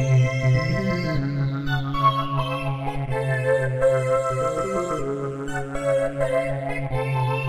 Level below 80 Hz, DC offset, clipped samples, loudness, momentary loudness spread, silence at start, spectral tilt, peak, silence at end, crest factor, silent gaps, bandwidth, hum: -40 dBFS; under 0.1%; under 0.1%; -24 LUFS; 7 LU; 0 s; -7 dB/octave; -6 dBFS; 0 s; 16 dB; none; 11.5 kHz; none